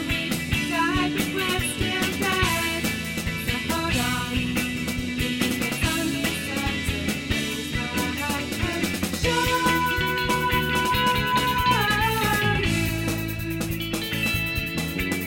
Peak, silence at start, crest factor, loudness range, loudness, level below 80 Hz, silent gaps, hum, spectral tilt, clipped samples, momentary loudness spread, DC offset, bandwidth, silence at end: -8 dBFS; 0 s; 16 dB; 4 LU; -24 LUFS; -38 dBFS; none; none; -4 dB/octave; under 0.1%; 6 LU; under 0.1%; 17 kHz; 0 s